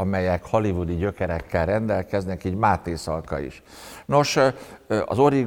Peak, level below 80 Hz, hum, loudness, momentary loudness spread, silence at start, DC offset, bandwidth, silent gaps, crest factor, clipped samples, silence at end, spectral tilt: -6 dBFS; -46 dBFS; none; -24 LUFS; 11 LU; 0 s; under 0.1%; 17.5 kHz; none; 18 dB; under 0.1%; 0 s; -6 dB/octave